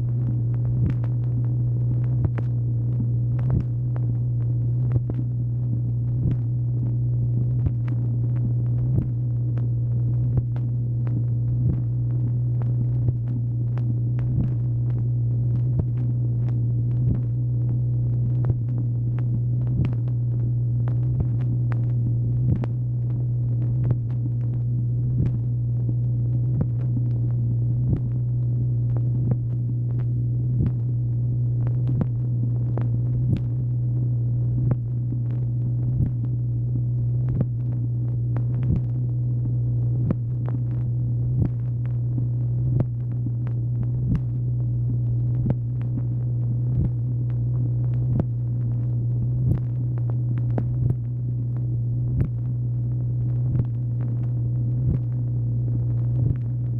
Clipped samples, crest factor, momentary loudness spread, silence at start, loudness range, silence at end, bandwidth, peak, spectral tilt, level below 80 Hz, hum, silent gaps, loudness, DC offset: under 0.1%; 14 dB; 2 LU; 0 s; 1 LU; 0 s; 1.9 kHz; -10 dBFS; -12.5 dB/octave; -38 dBFS; none; none; -24 LUFS; under 0.1%